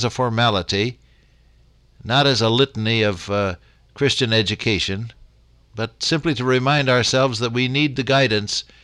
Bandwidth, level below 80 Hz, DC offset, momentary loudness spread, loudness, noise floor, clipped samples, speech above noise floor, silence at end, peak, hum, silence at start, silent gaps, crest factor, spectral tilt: 11 kHz; -48 dBFS; under 0.1%; 9 LU; -19 LUFS; -54 dBFS; under 0.1%; 34 dB; 0.2 s; -4 dBFS; none; 0 s; none; 16 dB; -4.5 dB/octave